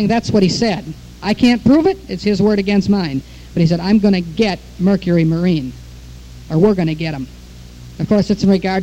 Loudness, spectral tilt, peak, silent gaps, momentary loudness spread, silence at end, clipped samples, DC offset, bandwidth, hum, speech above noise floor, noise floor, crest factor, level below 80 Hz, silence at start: -16 LUFS; -7 dB/octave; 0 dBFS; none; 12 LU; 0 s; under 0.1%; under 0.1%; 9.6 kHz; none; 21 dB; -36 dBFS; 14 dB; -38 dBFS; 0 s